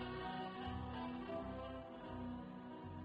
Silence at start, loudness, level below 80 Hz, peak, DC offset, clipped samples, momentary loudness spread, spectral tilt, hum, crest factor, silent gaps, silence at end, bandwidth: 0 s; -48 LUFS; -60 dBFS; -34 dBFS; under 0.1%; under 0.1%; 6 LU; -8 dB/octave; none; 12 dB; none; 0 s; 5.2 kHz